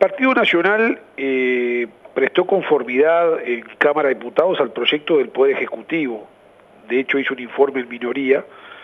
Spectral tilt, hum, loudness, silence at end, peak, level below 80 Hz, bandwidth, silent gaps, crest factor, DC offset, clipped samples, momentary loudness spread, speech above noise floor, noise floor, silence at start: -6.5 dB/octave; none; -18 LUFS; 0 s; 0 dBFS; -70 dBFS; 6 kHz; none; 18 dB; under 0.1%; under 0.1%; 9 LU; 30 dB; -48 dBFS; 0 s